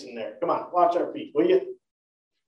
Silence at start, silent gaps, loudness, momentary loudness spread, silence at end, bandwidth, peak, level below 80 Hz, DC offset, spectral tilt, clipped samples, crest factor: 0 s; none; -25 LUFS; 11 LU; 0.75 s; 7 kHz; -8 dBFS; -80 dBFS; under 0.1%; -7 dB/octave; under 0.1%; 18 dB